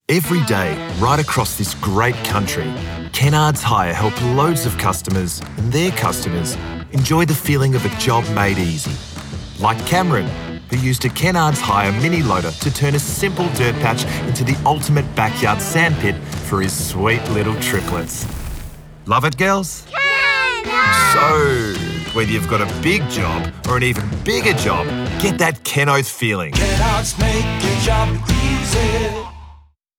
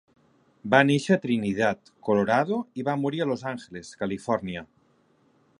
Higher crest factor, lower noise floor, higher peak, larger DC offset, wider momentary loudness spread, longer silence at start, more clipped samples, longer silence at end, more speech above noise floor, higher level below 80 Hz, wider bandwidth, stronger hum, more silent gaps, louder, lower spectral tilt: second, 14 dB vs 24 dB; second, -45 dBFS vs -64 dBFS; about the same, -4 dBFS vs -2 dBFS; neither; second, 8 LU vs 15 LU; second, 0.1 s vs 0.65 s; neither; second, 0.45 s vs 0.95 s; second, 28 dB vs 39 dB; first, -32 dBFS vs -62 dBFS; first, 19 kHz vs 11 kHz; neither; neither; first, -17 LUFS vs -25 LUFS; second, -4.5 dB/octave vs -6 dB/octave